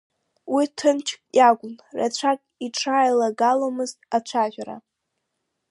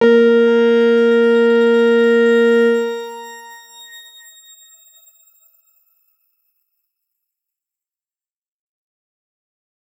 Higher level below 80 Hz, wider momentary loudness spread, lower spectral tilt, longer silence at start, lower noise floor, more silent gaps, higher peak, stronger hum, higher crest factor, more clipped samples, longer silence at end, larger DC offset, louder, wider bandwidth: about the same, -76 dBFS vs -80 dBFS; second, 12 LU vs 23 LU; second, -3 dB/octave vs -5 dB/octave; first, 0.45 s vs 0 s; second, -78 dBFS vs under -90 dBFS; neither; about the same, -4 dBFS vs -2 dBFS; neither; about the same, 18 dB vs 16 dB; neither; second, 0.9 s vs 6 s; neither; second, -22 LUFS vs -13 LUFS; second, 11.5 kHz vs 16 kHz